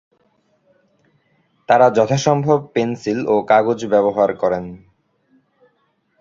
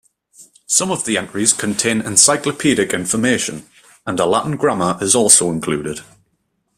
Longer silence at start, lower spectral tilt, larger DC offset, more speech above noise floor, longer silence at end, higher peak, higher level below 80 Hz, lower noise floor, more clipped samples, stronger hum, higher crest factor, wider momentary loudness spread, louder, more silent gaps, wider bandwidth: first, 1.7 s vs 0.4 s; first, -6 dB/octave vs -2.5 dB/octave; neither; about the same, 49 dB vs 51 dB; first, 1.45 s vs 0.75 s; about the same, -2 dBFS vs 0 dBFS; about the same, -56 dBFS vs -54 dBFS; about the same, -65 dBFS vs -67 dBFS; neither; neither; about the same, 18 dB vs 18 dB; second, 8 LU vs 13 LU; about the same, -16 LUFS vs -15 LUFS; neither; second, 7.6 kHz vs 16 kHz